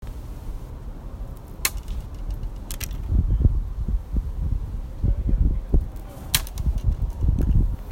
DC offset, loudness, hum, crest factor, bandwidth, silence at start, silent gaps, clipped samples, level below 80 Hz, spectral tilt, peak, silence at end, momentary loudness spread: under 0.1%; -26 LUFS; none; 22 dB; 16.5 kHz; 0 s; none; under 0.1%; -24 dBFS; -4.5 dB/octave; -2 dBFS; 0 s; 15 LU